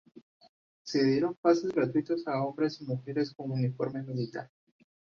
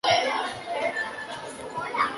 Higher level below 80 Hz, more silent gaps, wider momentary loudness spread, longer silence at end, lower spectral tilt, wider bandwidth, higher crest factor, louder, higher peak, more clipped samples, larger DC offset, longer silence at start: second, -72 dBFS vs -64 dBFS; first, 0.22-0.40 s, 0.49-0.85 s, 1.37-1.43 s vs none; about the same, 10 LU vs 12 LU; first, 0.7 s vs 0 s; first, -7 dB/octave vs -2.5 dB/octave; second, 7.2 kHz vs 11.5 kHz; about the same, 20 dB vs 18 dB; second, -31 LUFS vs -28 LUFS; about the same, -12 dBFS vs -10 dBFS; neither; neither; about the same, 0.15 s vs 0.05 s